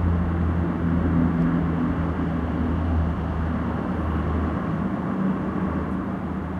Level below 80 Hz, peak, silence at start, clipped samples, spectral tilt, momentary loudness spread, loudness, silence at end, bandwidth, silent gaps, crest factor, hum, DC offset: -32 dBFS; -10 dBFS; 0 s; under 0.1%; -10 dB/octave; 5 LU; -25 LUFS; 0 s; 4.9 kHz; none; 14 dB; none; under 0.1%